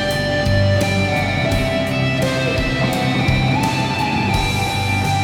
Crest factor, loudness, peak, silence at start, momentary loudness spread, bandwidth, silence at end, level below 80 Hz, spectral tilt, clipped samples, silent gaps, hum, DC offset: 14 dB; -18 LUFS; -4 dBFS; 0 s; 2 LU; 18 kHz; 0 s; -30 dBFS; -5.5 dB/octave; under 0.1%; none; none; under 0.1%